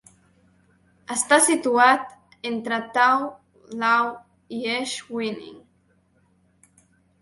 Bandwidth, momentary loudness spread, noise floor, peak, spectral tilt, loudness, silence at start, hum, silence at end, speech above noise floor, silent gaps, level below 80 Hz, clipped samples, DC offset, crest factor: 12 kHz; 18 LU; -63 dBFS; -2 dBFS; -1.5 dB/octave; -21 LUFS; 1.1 s; none; 1.65 s; 42 dB; none; -70 dBFS; under 0.1%; under 0.1%; 24 dB